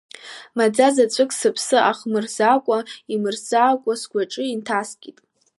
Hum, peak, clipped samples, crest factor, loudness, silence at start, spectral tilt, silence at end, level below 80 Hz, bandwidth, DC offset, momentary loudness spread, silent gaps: none; -2 dBFS; under 0.1%; 18 dB; -20 LUFS; 0.25 s; -3 dB/octave; 0.5 s; -78 dBFS; 11.5 kHz; under 0.1%; 11 LU; none